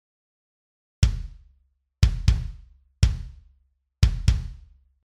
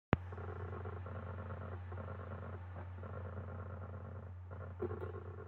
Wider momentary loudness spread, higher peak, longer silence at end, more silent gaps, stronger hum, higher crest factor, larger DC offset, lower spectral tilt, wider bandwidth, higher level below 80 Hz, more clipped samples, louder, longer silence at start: first, 17 LU vs 6 LU; first, -4 dBFS vs -14 dBFS; first, 0.5 s vs 0 s; neither; neither; second, 22 dB vs 30 dB; neither; second, -5.5 dB/octave vs -10 dB/octave; first, 11.5 kHz vs 4.3 kHz; first, -28 dBFS vs -62 dBFS; neither; first, -25 LUFS vs -46 LUFS; first, 1 s vs 0.1 s